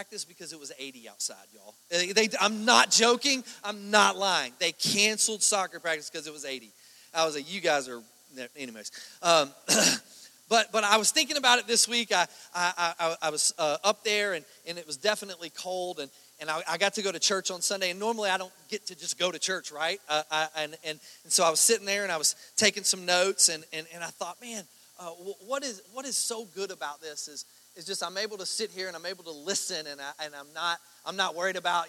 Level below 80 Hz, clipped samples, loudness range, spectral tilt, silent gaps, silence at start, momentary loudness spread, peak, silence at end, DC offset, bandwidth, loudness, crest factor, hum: -80 dBFS; under 0.1%; 10 LU; -0.5 dB/octave; none; 0 s; 17 LU; -2 dBFS; 0 s; under 0.1%; 17 kHz; -27 LUFS; 28 dB; none